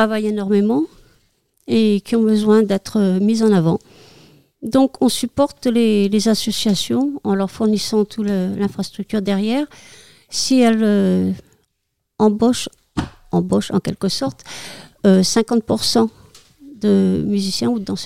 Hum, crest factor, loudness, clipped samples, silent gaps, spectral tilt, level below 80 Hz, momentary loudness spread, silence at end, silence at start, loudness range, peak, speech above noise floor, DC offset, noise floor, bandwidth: none; 14 dB; -18 LUFS; under 0.1%; none; -5.5 dB/octave; -52 dBFS; 10 LU; 0 s; 0 s; 3 LU; -4 dBFS; 56 dB; 0.5%; -73 dBFS; 15.5 kHz